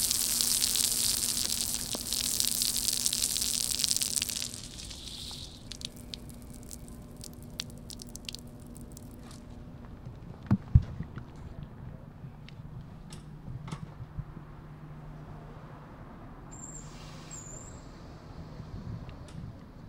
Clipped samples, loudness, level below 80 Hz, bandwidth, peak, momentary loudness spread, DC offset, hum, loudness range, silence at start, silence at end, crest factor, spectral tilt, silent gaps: under 0.1%; -29 LUFS; -46 dBFS; 19 kHz; -4 dBFS; 21 LU; under 0.1%; none; 18 LU; 0 s; 0 s; 32 dB; -2 dB/octave; none